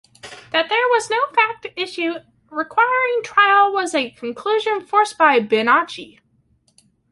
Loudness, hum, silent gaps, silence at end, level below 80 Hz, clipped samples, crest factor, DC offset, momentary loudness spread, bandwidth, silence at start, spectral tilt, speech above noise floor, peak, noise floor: -18 LUFS; none; none; 1.05 s; -68 dBFS; under 0.1%; 18 dB; under 0.1%; 13 LU; 11.5 kHz; 0.25 s; -2.5 dB/octave; 43 dB; -2 dBFS; -61 dBFS